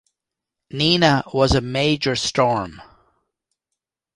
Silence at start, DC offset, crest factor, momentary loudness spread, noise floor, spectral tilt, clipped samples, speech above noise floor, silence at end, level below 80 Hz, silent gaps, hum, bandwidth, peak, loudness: 0.75 s; under 0.1%; 20 dB; 9 LU; -84 dBFS; -4.5 dB/octave; under 0.1%; 66 dB; 1.35 s; -40 dBFS; none; none; 11.5 kHz; -2 dBFS; -19 LUFS